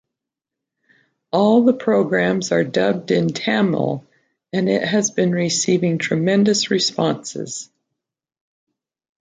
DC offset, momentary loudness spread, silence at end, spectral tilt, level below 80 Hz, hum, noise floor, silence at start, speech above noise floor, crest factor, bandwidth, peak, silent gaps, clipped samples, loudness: under 0.1%; 10 LU; 1.55 s; -4.5 dB/octave; -62 dBFS; none; -84 dBFS; 1.35 s; 66 dB; 16 dB; 9.6 kHz; -4 dBFS; none; under 0.1%; -18 LUFS